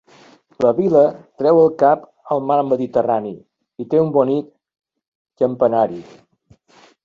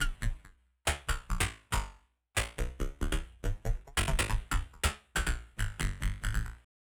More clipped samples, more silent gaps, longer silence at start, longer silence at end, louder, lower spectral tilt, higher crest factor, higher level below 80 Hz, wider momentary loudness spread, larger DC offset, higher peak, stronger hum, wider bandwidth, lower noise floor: neither; first, 5.08-5.25 s vs none; first, 0.6 s vs 0 s; first, 1 s vs 0.3 s; first, -17 LUFS vs -35 LUFS; first, -9 dB/octave vs -3.5 dB/octave; about the same, 16 dB vs 18 dB; second, -62 dBFS vs -36 dBFS; about the same, 9 LU vs 7 LU; neither; first, -2 dBFS vs -16 dBFS; neither; second, 7 kHz vs over 20 kHz; second, -54 dBFS vs -59 dBFS